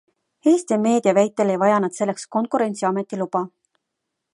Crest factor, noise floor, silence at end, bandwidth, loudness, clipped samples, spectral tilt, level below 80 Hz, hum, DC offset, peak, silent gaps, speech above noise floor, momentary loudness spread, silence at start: 18 dB; -80 dBFS; 0.85 s; 11.5 kHz; -20 LUFS; under 0.1%; -6 dB/octave; -74 dBFS; none; under 0.1%; -4 dBFS; none; 60 dB; 8 LU; 0.45 s